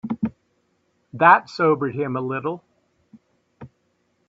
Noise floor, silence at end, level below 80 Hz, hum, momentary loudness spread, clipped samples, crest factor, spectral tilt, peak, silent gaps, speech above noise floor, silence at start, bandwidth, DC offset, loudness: -68 dBFS; 0.65 s; -66 dBFS; none; 15 LU; under 0.1%; 24 dB; -7.5 dB/octave; 0 dBFS; none; 49 dB; 0.05 s; 7.8 kHz; under 0.1%; -20 LUFS